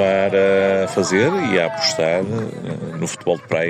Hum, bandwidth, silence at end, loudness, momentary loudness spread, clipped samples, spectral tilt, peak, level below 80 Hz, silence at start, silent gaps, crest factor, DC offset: none; 15.5 kHz; 0 s; -18 LUFS; 10 LU; under 0.1%; -4.5 dB/octave; -4 dBFS; -62 dBFS; 0 s; none; 14 dB; under 0.1%